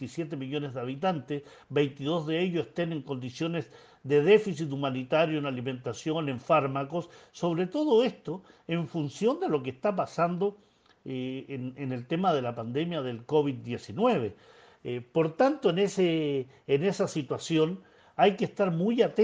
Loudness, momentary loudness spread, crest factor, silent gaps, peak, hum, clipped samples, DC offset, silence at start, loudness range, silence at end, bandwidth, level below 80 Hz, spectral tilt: -29 LUFS; 12 LU; 20 dB; none; -8 dBFS; none; under 0.1%; under 0.1%; 0 s; 4 LU; 0 s; 9.4 kHz; -72 dBFS; -6.5 dB/octave